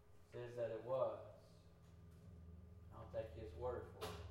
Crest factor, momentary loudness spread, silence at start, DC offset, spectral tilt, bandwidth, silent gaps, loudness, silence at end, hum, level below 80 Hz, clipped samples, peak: 20 dB; 21 LU; 0 s; under 0.1%; -6.5 dB/octave; 16 kHz; none; -48 LUFS; 0 s; none; -64 dBFS; under 0.1%; -30 dBFS